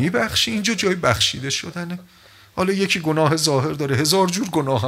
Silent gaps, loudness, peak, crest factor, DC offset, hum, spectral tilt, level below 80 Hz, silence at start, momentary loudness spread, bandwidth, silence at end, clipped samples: none; -19 LUFS; 0 dBFS; 20 dB; under 0.1%; none; -4 dB/octave; -52 dBFS; 0 s; 11 LU; 16 kHz; 0 s; under 0.1%